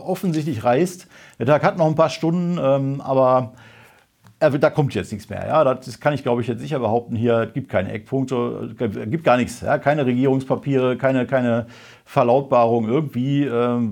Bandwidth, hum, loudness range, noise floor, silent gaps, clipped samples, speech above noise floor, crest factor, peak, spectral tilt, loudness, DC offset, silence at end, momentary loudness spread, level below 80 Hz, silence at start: 17 kHz; none; 2 LU; -53 dBFS; none; under 0.1%; 33 dB; 18 dB; -2 dBFS; -7.5 dB/octave; -20 LUFS; under 0.1%; 0 s; 8 LU; -60 dBFS; 0 s